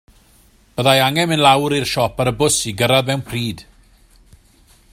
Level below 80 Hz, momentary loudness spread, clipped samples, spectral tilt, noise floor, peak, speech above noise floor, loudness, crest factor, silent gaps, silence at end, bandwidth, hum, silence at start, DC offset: -46 dBFS; 11 LU; under 0.1%; -4 dB/octave; -52 dBFS; 0 dBFS; 35 dB; -16 LUFS; 18 dB; none; 1.3 s; 16 kHz; none; 0.75 s; under 0.1%